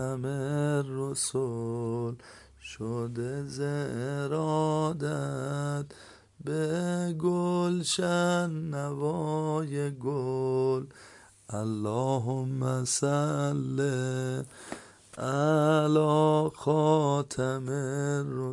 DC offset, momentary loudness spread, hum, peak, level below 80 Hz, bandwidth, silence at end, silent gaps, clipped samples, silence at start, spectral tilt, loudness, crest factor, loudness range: under 0.1%; 11 LU; none; -12 dBFS; -66 dBFS; 11.5 kHz; 0 s; none; under 0.1%; 0 s; -6 dB/octave; -29 LUFS; 18 dB; 6 LU